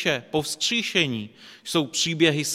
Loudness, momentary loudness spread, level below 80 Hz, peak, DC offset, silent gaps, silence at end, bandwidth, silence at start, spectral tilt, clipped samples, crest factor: -23 LUFS; 12 LU; -62 dBFS; -4 dBFS; under 0.1%; none; 0 s; 16 kHz; 0 s; -3 dB/octave; under 0.1%; 20 dB